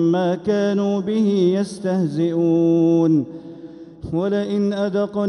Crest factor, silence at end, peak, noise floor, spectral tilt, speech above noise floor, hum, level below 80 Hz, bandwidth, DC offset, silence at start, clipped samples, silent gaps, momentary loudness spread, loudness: 10 dB; 0 s; -8 dBFS; -38 dBFS; -8 dB/octave; 20 dB; none; -54 dBFS; 11 kHz; under 0.1%; 0 s; under 0.1%; none; 17 LU; -19 LUFS